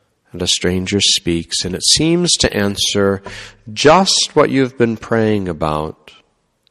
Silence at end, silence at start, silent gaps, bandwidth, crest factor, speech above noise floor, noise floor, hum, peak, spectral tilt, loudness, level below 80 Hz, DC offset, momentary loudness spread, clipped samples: 0.8 s; 0.35 s; none; 14.5 kHz; 16 dB; 44 dB; -60 dBFS; none; 0 dBFS; -3.5 dB/octave; -14 LUFS; -40 dBFS; under 0.1%; 11 LU; under 0.1%